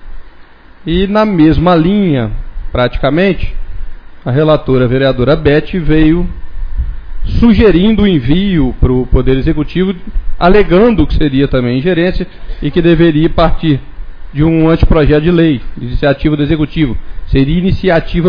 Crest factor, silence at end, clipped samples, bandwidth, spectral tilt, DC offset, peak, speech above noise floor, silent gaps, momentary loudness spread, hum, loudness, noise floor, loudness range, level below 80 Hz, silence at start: 10 dB; 0 s; under 0.1%; 5.2 kHz; -9.5 dB/octave; under 0.1%; 0 dBFS; 26 dB; none; 14 LU; none; -11 LUFS; -35 dBFS; 2 LU; -18 dBFS; 0 s